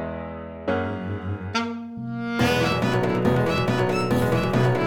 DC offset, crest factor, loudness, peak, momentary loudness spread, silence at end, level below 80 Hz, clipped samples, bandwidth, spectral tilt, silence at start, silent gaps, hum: under 0.1%; 16 dB; -24 LUFS; -8 dBFS; 11 LU; 0 s; -46 dBFS; under 0.1%; 17.5 kHz; -6.5 dB/octave; 0 s; none; none